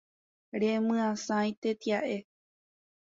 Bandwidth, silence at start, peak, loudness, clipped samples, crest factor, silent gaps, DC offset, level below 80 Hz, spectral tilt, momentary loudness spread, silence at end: 7.8 kHz; 0.55 s; -18 dBFS; -31 LUFS; under 0.1%; 14 dB; 1.57-1.62 s; under 0.1%; -76 dBFS; -5 dB/octave; 8 LU; 0.85 s